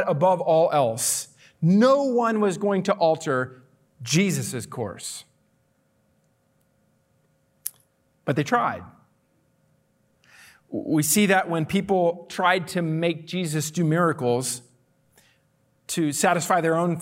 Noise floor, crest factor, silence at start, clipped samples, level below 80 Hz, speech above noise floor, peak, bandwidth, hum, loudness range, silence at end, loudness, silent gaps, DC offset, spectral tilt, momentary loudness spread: -67 dBFS; 18 dB; 0 s; under 0.1%; -68 dBFS; 44 dB; -6 dBFS; 16 kHz; none; 9 LU; 0 s; -23 LUFS; none; under 0.1%; -4.5 dB/octave; 15 LU